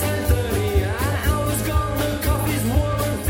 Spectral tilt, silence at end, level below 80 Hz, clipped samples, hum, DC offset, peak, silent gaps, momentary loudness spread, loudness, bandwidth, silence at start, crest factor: -5.5 dB/octave; 0 s; -26 dBFS; under 0.1%; none; under 0.1%; -6 dBFS; none; 2 LU; -21 LUFS; 16.5 kHz; 0 s; 16 dB